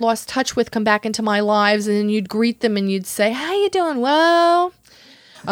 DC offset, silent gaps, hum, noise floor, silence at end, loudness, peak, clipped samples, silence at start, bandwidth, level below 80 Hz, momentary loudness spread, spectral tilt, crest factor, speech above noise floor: under 0.1%; none; none; -48 dBFS; 0 s; -18 LUFS; -2 dBFS; under 0.1%; 0 s; 17 kHz; -60 dBFS; 6 LU; -4 dB/octave; 18 dB; 30 dB